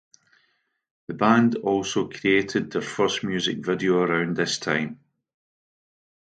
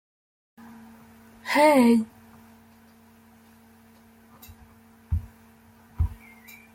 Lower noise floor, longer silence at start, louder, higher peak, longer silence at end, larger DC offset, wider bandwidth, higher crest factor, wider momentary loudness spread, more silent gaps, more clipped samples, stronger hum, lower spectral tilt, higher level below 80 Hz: first, -70 dBFS vs -54 dBFS; second, 1.1 s vs 1.45 s; about the same, -23 LUFS vs -23 LUFS; first, -4 dBFS vs -8 dBFS; first, 1.25 s vs 0.6 s; neither; second, 9.2 kHz vs 16.5 kHz; about the same, 22 dB vs 22 dB; second, 7 LU vs 30 LU; neither; neither; neither; second, -4.5 dB/octave vs -6 dB/octave; second, -64 dBFS vs -42 dBFS